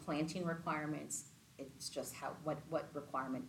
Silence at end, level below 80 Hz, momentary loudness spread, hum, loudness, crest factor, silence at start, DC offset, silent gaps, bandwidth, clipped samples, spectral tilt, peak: 0 s; -74 dBFS; 7 LU; none; -43 LUFS; 16 dB; 0 s; under 0.1%; none; 17 kHz; under 0.1%; -4.5 dB/octave; -26 dBFS